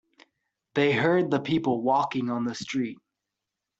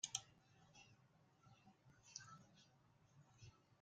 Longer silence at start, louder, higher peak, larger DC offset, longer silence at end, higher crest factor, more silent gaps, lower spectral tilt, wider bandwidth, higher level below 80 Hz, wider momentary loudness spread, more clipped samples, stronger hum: first, 0.75 s vs 0.05 s; first, -26 LUFS vs -56 LUFS; first, -10 dBFS vs -26 dBFS; neither; first, 0.85 s vs 0 s; second, 16 dB vs 34 dB; neither; first, -6 dB/octave vs -0.5 dB/octave; second, 8 kHz vs 9 kHz; first, -68 dBFS vs -86 dBFS; second, 8 LU vs 18 LU; neither; neither